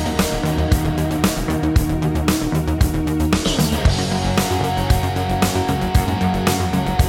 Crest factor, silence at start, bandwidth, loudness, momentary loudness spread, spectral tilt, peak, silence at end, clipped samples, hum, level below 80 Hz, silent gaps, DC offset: 16 dB; 0 s; 17 kHz; -19 LUFS; 2 LU; -5.5 dB/octave; -2 dBFS; 0 s; under 0.1%; none; -24 dBFS; none; under 0.1%